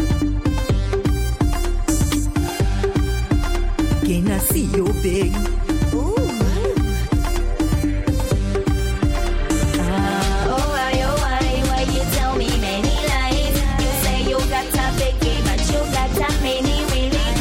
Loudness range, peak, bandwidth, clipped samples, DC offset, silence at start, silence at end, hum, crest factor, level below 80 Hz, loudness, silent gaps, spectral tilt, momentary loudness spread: 1 LU; -6 dBFS; 17 kHz; under 0.1%; under 0.1%; 0 s; 0 s; none; 12 dB; -22 dBFS; -20 LUFS; none; -5 dB/octave; 2 LU